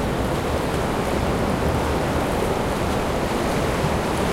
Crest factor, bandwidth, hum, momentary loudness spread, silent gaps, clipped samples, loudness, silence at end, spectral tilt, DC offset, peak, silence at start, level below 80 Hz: 14 dB; 16.5 kHz; none; 1 LU; none; under 0.1%; -23 LUFS; 0 s; -5.5 dB/octave; under 0.1%; -8 dBFS; 0 s; -32 dBFS